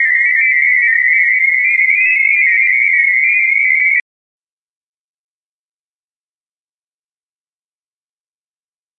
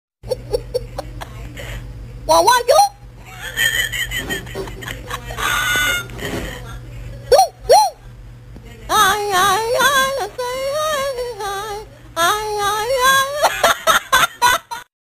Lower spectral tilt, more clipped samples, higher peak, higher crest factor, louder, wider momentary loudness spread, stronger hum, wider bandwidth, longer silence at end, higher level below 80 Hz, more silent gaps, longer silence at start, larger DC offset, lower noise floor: second, 1.5 dB/octave vs -1.5 dB/octave; neither; about the same, -2 dBFS vs -2 dBFS; about the same, 14 dB vs 16 dB; first, -9 LUFS vs -16 LUFS; second, 1 LU vs 19 LU; neither; second, 5.6 kHz vs 16 kHz; first, 5 s vs 0.15 s; second, -82 dBFS vs -38 dBFS; neither; second, 0 s vs 0.25 s; neither; first, under -90 dBFS vs -37 dBFS